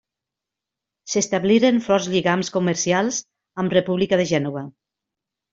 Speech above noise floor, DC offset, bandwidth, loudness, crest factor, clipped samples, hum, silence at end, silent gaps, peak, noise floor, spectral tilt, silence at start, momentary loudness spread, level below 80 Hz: 66 dB; under 0.1%; 7.8 kHz; -20 LUFS; 18 dB; under 0.1%; none; 0.85 s; none; -4 dBFS; -86 dBFS; -4.5 dB/octave; 1.05 s; 12 LU; -60 dBFS